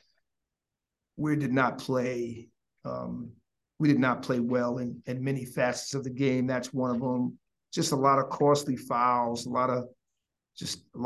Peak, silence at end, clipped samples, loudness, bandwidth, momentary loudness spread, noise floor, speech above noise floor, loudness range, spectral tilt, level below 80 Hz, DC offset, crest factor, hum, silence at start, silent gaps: -8 dBFS; 0 s; under 0.1%; -29 LUFS; 12.5 kHz; 13 LU; -88 dBFS; 60 dB; 5 LU; -5.5 dB/octave; -66 dBFS; under 0.1%; 20 dB; none; 1.15 s; none